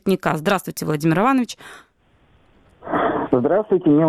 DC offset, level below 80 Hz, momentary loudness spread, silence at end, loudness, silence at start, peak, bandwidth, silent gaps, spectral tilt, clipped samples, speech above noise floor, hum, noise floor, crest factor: under 0.1%; -54 dBFS; 9 LU; 0 s; -20 LUFS; 0.05 s; -4 dBFS; 15.5 kHz; none; -6.5 dB/octave; under 0.1%; 39 dB; none; -57 dBFS; 16 dB